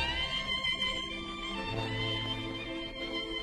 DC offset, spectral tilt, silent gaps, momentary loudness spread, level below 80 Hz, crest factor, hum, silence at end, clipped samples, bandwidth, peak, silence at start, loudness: under 0.1%; -4 dB/octave; none; 7 LU; -48 dBFS; 16 dB; none; 0 s; under 0.1%; 13 kHz; -18 dBFS; 0 s; -33 LUFS